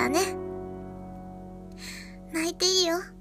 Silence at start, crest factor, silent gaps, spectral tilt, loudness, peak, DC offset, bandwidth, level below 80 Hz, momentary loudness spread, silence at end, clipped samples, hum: 0 s; 20 dB; none; -2.5 dB/octave; -26 LUFS; -10 dBFS; under 0.1%; 15.5 kHz; -52 dBFS; 20 LU; 0 s; under 0.1%; none